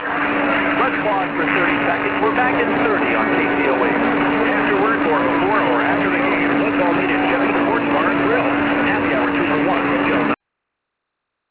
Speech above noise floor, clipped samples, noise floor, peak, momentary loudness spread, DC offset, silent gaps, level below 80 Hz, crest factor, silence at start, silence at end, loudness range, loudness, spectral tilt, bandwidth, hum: 61 dB; under 0.1%; -79 dBFS; -4 dBFS; 1 LU; under 0.1%; none; -48 dBFS; 14 dB; 0 s; 1.15 s; 1 LU; -17 LUFS; -9 dB/octave; 4 kHz; none